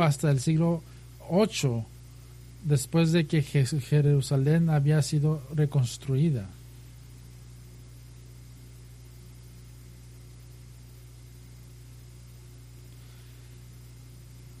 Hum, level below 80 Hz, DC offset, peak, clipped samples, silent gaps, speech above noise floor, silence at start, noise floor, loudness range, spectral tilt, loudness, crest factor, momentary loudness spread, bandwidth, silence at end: 60 Hz at -45 dBFS; -52 dBFS; under 0.1%; -10 dBFS; under 0.1%; none; 23 dB; 0 s; -47 dBFS; 23 LU; -6.5 dB/octave; -26 LUFS; 18 dB; 25 LU; 14 kHz; 0 s